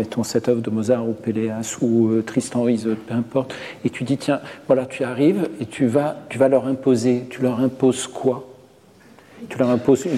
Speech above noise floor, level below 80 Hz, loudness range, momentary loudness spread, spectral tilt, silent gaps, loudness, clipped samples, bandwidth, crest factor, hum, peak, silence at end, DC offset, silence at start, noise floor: 29 dB; -62 dBFS; 2 LU; 8 LU; -6 dB/octave; none; -21 LUFS; under 0.1%; 14 kHz; 16 dB; none; -4 dBFS; 0 s; under 0.1%; 0 s; -49 dBFS